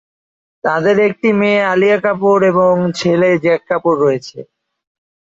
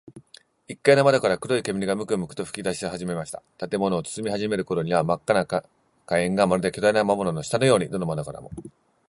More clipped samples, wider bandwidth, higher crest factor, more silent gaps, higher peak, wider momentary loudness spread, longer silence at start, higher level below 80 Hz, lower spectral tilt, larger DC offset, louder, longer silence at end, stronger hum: neither; second, 7.8 kHz vs 11.5 kHz; second, 12 dB vs 22 dB; neither; about the same, -2 dBFS vs -2 dBFS; second, 5 LU vs 12 LU; first, 0.65 s vs 0.05 s; about the same, -58 dBFS vs -56 dBFS; first, -6.5 dB/octave vs -5 dB/octave; neither; first, -13 LUFS vs -24 LUFS; first, 0.95 s vs 0.4 s; neither